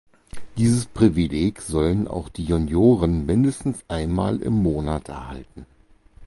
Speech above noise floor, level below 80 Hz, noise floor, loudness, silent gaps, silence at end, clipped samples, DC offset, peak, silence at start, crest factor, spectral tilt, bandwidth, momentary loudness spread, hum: 28 dB; -36 dBFS; -49 dBFS; -22 LUFS; none; 0 s; under 0.1%; under 0.1%; -4 dBFS; 0.35 s; 18 dB; -7 dB/octave; 11.5 kHz; 12 LU; none